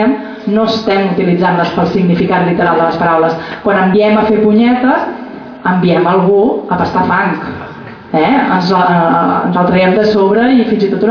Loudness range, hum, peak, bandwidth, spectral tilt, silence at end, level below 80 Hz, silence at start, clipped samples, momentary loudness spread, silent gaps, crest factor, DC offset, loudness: 2 LU; none; 0 dBFS; 5.4 kHz; -8 dB/octave; 0 s; -44 dBFS; 0 s; under 0.1%; 8 LU; none; 10 dB; under 0.1%; -11 LUFS